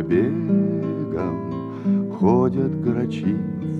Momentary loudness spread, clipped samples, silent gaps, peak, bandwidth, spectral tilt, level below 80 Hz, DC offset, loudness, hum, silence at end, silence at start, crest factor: 7 LU; under 0.1%; none; -6 dBFS; 6.2 kHz; -10 dB/octave; -56 dBFS; under 0.1%; -22 LUFS; none; 0 s; 0 s; 16 dB